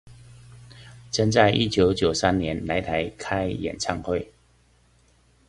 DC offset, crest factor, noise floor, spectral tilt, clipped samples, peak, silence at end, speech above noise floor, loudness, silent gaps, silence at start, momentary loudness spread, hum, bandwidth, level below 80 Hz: under 0.1%; 22 dB; -60 dBFS; -5 dB/octave; under 0.1%; -4 dBFS; 1.25 s; 37 dB; -24 LUFS; none; 0.05 s; 10 LU; none; 11.5 kHz; -44 dBFS